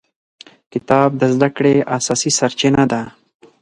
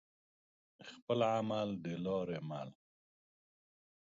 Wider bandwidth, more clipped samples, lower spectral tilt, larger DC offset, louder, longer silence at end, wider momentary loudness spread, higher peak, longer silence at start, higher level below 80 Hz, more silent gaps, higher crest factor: first, 11.5 kHz vs 7.4 kHz; neither; about the same, -4.5 dB/octave vs -5.5 dB/octave; neither; first, -15 LUFS vs -38 LUFS; second, 0.55 s vs 1.45 s; second, 11 LU vs 19 LU; first, 0 dBFS vs -20 dBFS; about the same, 0.75 s vs 0.8 s; first, -50 dBFS vs -76 dBFS; second, none vs 1.02-1.07 s; about the same, 16 dB vs 20 dB